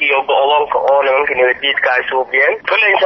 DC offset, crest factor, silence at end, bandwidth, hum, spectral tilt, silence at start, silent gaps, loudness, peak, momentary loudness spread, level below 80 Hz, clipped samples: under 0.1%; 12 dB; 0 s; 6 kHz; none; -4 dB/octave; 0 s; none; -13 LUFS; -2 dBFS; 2 LU; -56 dBFS; under 0.1%